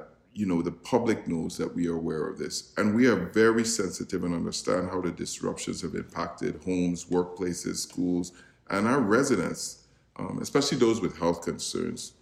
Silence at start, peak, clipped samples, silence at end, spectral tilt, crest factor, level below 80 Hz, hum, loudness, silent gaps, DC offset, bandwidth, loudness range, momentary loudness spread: 0 s; -10 dBFS; under 0.1%; 0.15 s; -4.5 dB/octave; 18 dB; -58 dBFS; none; -28 LUFS; none; under 0.1%; 15.5 kHz; 4 LU; 10 LU